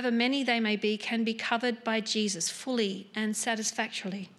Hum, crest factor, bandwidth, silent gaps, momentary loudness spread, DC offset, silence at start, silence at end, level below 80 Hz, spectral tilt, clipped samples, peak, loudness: none; 18 dB; 13.5 kHz; none; 5 LU; under 0.1%; 0 s; 0.1 s; -84 dBFS; -3 dB/octave; under 0.1%; -12 dBFS; -29 LUFS